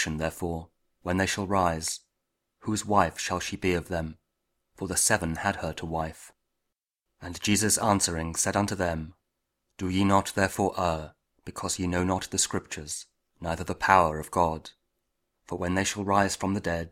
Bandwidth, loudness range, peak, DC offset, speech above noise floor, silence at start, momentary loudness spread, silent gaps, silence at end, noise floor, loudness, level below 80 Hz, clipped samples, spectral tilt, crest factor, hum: 16 kHz; 3 LU; -2 dBFS; under 0.1%; 56 dB; 0 s; 15 LU; none; 0 s; -84 dBFS; -27 LUFS; -50 dBFS; under 0.1%; -4 dB/octave; 26 dB; none